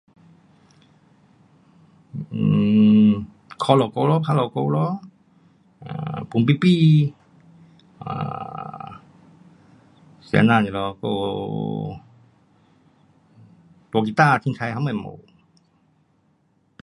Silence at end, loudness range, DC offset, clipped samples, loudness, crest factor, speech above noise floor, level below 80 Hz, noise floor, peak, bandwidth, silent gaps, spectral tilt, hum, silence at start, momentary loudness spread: 1.65 s; 7 LU; under 0.1%; under 0.1%; -20 LUFS; 22 dB; 44 dB; -58 dBFS; -64 dBFS; 0 dBFS; 11 kHz; none; -8 dB/octave; none; 2.15 s; 19 LU